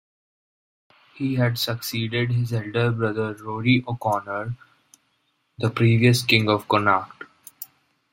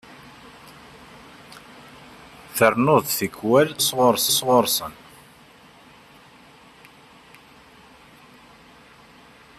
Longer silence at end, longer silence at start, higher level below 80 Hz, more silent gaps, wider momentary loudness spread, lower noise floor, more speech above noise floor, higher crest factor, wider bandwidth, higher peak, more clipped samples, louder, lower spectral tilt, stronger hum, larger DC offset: second, 0.5 s vs 4.65 s; first, 1.15 s vs 0.65 s; about the same, -58 dBFS vs -62 dBFS; neither; second, 21 LU vs 27 LU; first, -70 dBFS vs -50 dBFS; first, 48 dB vs 31 dB; about the same, 24 dB vs 22 dB; first, 16.5 kHz vs 14.5 kHz; first, 0 dBFS vs -4 dBFS; neither; second, -22 LUFS vs -19 LUFS; first, -6 dB/octave vs -3.5 dB/octave; neither; neither